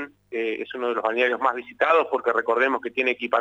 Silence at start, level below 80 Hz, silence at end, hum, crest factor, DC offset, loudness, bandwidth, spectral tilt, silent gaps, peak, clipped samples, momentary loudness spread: 0 s; -72 dBFS; 0 s; 50 Hz at -65 dBFS; 16 dB; under 0.1%; -23 LUFS; 8 kHz; -4 dB/octave; none; -6 dBFS; under 0.1%; 8 LU